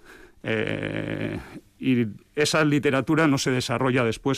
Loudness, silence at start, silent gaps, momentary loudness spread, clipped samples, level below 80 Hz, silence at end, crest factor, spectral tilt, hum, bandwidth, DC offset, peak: -24 LUFS; 0.1 s; none; 10 LU; under 0.1%; -54 dBFS; 0 s; 14 dB; -5 dB/octave; none; 15.5 kHz; under 0.1%; -12 dBFS